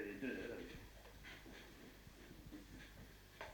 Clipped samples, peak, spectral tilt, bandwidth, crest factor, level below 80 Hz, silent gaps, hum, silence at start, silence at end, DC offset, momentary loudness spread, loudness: under 0.1%; -32 dBFS; -5 dB/octave; 19 kHz; 20 dB; -64 dBFS; none; none; 0 s; 0 s; under 0.1%; 13 LU; -54 LUFS